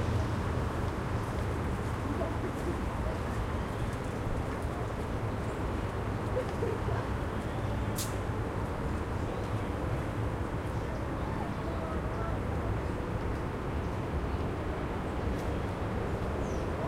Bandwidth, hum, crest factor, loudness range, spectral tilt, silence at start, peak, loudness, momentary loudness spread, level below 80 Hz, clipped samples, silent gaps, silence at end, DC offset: 16.5 kHz; none; 14 dB; 1 LU; -7 dB/octave; 0 s; -18 dBFS; -34 LUFS; 2 LU; -40 dBFS; under 0.1%; none; 0 s; under 0.1%